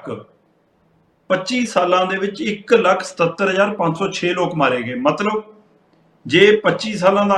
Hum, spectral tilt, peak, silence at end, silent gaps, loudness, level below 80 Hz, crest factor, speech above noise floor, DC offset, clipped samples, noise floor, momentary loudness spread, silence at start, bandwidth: none; -5 dB/octave; 0 dBFS; 0 s; none; -17 LUFS; -62 dBFS; 18 dB; 42 dB; under 0.1%; under 0.1%; -59 dBFS; 9 LU; 0.05 s; 11 kHz